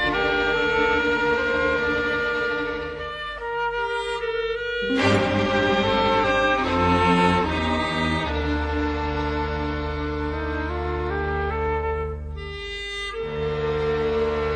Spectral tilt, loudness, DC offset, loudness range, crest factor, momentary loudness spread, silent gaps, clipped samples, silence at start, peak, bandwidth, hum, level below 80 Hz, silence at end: -6 dB/octave; -23 LUFS; under 0.1%; 7 LU; 18 dB; 9 LU; none; under 0.1%; 0 s; -4 dBFS; 10.5 kHz; none; -36 dBFS; 0 s